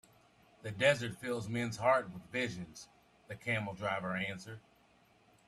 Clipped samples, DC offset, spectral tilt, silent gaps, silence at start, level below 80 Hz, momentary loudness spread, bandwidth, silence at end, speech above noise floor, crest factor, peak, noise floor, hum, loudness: under 0.1%; under 0.1%; -5 dB/octave; none; 0.65 s; -70 dBFS; 19 LU; 14 kHz; 0.9 s; 32 dB; 22 dB; -16 dBFS; -67 dBFS; none; -35 LUFS